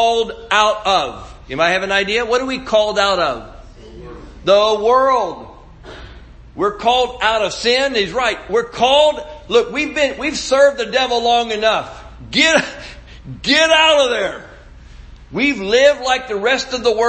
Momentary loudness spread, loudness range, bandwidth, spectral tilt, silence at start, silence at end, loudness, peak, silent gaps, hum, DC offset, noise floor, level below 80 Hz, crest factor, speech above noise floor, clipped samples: 16 LU; 3 LU; 8.8 kHz; -2.5 dB/octave; 0 s; 0 s; -15 LUFS; 0 dBFS; none; none; under 0.1%; -39 dBFS; -42 dBFS; 16 dB; 23 dB; under 0.1%